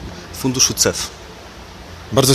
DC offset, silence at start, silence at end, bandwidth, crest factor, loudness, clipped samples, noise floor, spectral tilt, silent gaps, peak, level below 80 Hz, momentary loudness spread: under 0.1%; 0 s; 0 s; 14 kHz; 20 dB; -17 LUFS; under 0.1%; -36 dBFS; -3 dB/octave; none; 0 dBFS; -40 dBFS; 23 LU